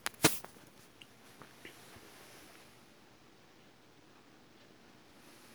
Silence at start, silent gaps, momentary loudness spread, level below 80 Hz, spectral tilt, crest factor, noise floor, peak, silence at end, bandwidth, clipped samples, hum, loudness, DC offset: 0.2 s; none; 25 LU; -72 dBFS; -2.5 dB/octave; 36 dB; -62 dBFS; -6 dBFS; 3.15 s; over 20 kHz; under 0.1%; none; -31 LUFS; under 0.1%